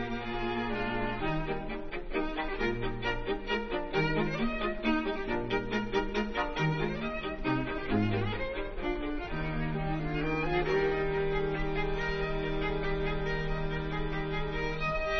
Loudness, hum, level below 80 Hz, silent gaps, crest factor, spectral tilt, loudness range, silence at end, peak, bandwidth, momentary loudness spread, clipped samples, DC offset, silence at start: -33 LUFS; none; -40 dBFS; none; 16 dB; -7 dB/octave; 2 LU; 0 s; -16 dBFS; 6.4 kHz; 5 LU; under 0.1%; 0.2%; 0 s